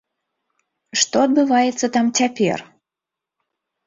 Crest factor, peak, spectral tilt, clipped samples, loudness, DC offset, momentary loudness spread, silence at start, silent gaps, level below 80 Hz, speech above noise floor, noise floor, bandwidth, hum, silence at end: 18 dB; -2 dBFS; -3 dB/octave; under 0.1%; -18 LUFS; under 0.1%; 6 LU; 0.95 s; none; -64 dBFS; 68 dB; -86 dBFS; 7.8 kHz; none; 1.25 s